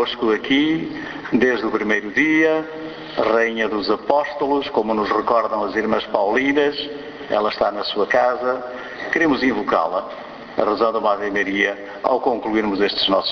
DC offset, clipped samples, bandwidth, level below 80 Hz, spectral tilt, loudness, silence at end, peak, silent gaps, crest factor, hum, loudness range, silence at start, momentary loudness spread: under 0.1%; under 0.1%; 6.8 kHz; -54 dBFS; -5 dB/octave; -19 LUFS; 0 s; 0 dBFS; none; 20 dB; none; 1 LU; 0 s; 9 LU